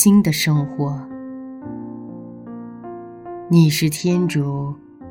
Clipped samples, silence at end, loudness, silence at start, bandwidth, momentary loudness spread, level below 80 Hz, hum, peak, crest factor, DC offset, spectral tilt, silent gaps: under 0.1%; 0 s; -18 LUFS; 0 s; 17 kHz; 20 LU; -54 dBFS; none; -2 dBFS; 18 dB; under 0.1%; -5.5 dB/octave; none